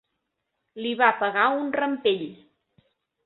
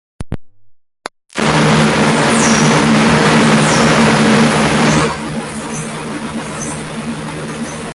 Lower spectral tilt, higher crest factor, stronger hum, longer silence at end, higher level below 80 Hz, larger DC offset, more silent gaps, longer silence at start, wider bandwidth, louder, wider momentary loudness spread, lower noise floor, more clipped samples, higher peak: first, -8 dB/octave vs -4.5 dB/octave; first, 22 dB vs 12 dB; neither; first, 0.9 s vs 0 s; second, -74 dBFS vs -38 dBFS; neither; neither; first, 0.75 s vs 0.2 s; second, 4.3 kHz vs 11.5 kHz; second, -24 LUFS vs -13 LUFS; second, 11 LU vs 14 LU; first, -79 dBFS vs -39 dBFS; neither; about the same, -4 dBFS vs -2 dBFS